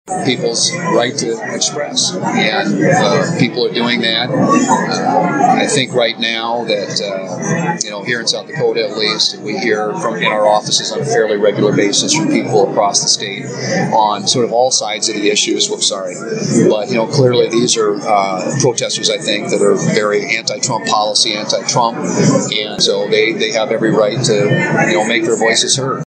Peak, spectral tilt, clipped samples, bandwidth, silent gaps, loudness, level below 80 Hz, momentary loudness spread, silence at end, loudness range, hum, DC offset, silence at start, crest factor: 0 dBFS; -3.5 dB/octave; under 0.1%; 9.6 kHz; none; -14 LUFS; -66 dBFS; 5 LU; 0 s; 2 LU; none; under 0.1%; 0.05 s; 14 dB